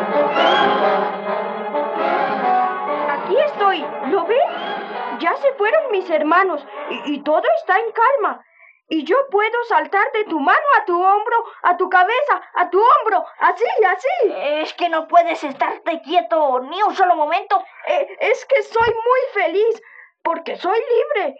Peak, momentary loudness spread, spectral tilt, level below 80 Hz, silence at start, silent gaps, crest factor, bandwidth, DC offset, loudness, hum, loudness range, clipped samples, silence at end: -2 dBFS; 8 LU; -4.5 dB/octave; -64 dBFS; 0 s; none; 16 dB; 7.8 kHz; under 0.1%; -18 LUFS; none; 3 LU; under 0.1%; 0.05 s